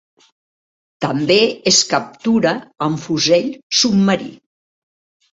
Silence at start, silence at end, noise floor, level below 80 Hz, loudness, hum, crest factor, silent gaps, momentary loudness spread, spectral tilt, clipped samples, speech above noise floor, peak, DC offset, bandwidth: 1 s; 1.05 s; under -90 dBFS; -58 dBFS; -16 LUFS; none; 18 dB; 3.63-3.70 s; 9 LU; -3.5 dB/octave; under 0.1%; over 74 dB; 0 dBFS; under 0.1%; 8 kHz